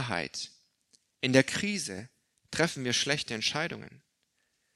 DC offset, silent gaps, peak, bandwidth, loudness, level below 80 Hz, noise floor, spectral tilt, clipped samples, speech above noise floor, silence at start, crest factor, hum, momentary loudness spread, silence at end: under 0.1%; none; -6 dBFS; 13 kHz; -30 LUFS; -66 dBFS; -76 dBFS; -3.5 dB/octave; under 0.1%; 46 dB; 0 s; 26 dB; none; 14 LU; 0.8 s